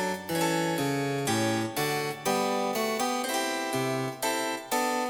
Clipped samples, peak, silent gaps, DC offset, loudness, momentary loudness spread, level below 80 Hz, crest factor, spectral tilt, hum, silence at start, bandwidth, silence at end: under 0.1%; -14 dBFS; none; under 0.1%; -28 LUFS; 3 LU; -68 dBFS; 14 dB; -4 dB/octave; none; 0 s; 19.5 kHz; 0 s